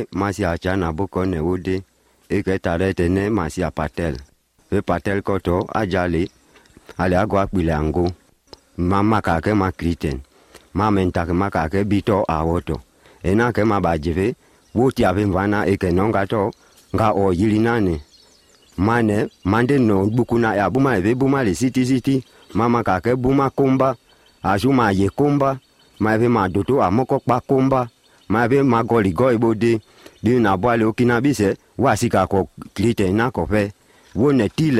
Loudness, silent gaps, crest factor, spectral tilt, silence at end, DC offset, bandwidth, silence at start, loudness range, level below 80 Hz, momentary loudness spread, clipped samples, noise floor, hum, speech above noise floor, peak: -19 LUFS; none; 16 dB; -7 dB/octave; 0 s; under 0.1%; 15 kHz; 0 s; 4 LU; -42 dBFS; 8 LU; under 0.1%; -53 dBFS; none; 35 dB; -2 dBFS